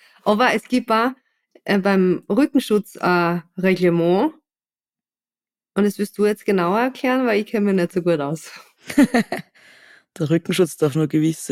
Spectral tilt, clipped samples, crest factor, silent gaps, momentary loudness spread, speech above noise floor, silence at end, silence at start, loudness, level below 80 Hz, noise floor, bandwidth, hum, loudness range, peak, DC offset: -6 dB/octave; under 0.1%; 16 dB; none; 7 LU; over 71 dB; 0.05 s; 0.25 s; -19 LUFS; -62 dBFS; under -90 dBFS; 16 kHz; none; 3 LU; -4 dBFS; under 0.1%